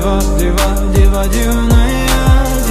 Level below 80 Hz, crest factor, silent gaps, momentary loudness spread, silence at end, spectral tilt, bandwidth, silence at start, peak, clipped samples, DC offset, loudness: -12 dBFS; 10 dB; none; 3 LU; 0 s; -5.5 dB/octave; 15.5 kHz; 0 s; 0 dBFS; under 0.1%; under 0.1%; -13 LUFS